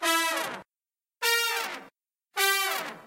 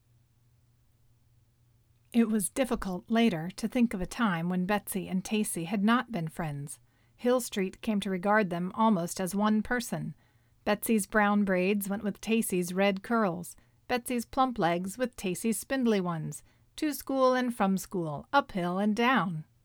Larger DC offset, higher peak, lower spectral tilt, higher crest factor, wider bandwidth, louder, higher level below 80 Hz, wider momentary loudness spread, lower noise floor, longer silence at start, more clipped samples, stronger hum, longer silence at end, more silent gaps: neither; first, -8 dBFS vs -12 dBFS; second, 0.5 dB/octave vs -5 dB/octave; about the same, 22 dB vs 18 dB; second, 16 kHz vs 19 kHz; about the same, -27 LUFS vs -29 LUFS; second, -82 dBFS vs -56 dBFS; first, 13 LU vs 9 LU; first, under -90 dBFS vs -66 dBFS; second, 0 s vs 2.15 s; neither; neither; second, 0 s vs 0.2 s; neither